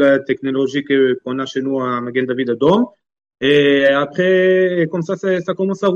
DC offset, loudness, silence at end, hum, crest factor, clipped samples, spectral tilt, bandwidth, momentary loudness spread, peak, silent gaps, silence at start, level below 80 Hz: under 0.1%; -16 LUFS; 0 s; none; 14 dB; under 0.1%; -6.5 dB/octave; 7.4 kHz; 8 LU; -2 dBFS; none; 0 s; -60 dBFS